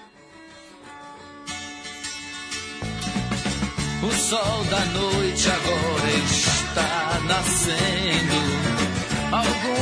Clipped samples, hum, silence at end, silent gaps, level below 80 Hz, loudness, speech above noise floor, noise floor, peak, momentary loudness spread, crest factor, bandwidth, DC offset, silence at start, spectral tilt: under 0.1%; none; 0 s; none; -40 dBFS; -22 LUFS; 25 dB; -47 dBFS; -6 dBFS; 13 LU; 18 dB; 11 kHz; under 0.1%; 0 s; -3.5 dB/octave